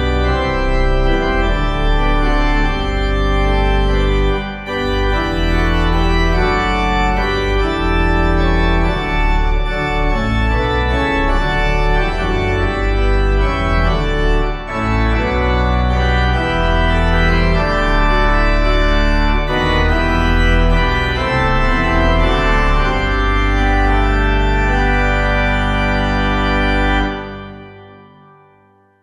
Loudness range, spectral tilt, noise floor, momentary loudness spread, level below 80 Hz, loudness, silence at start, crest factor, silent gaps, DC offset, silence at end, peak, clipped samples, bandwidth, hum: 2 LU; -6.5 dB/octave; -51 dBFS; 3 LU; -16 dBFS; -16 LUFS; 0 s; 12 dB; none; under 0.1%; 1.05 s; -2 dBFS; under 0.1%; 8.4 kHz; none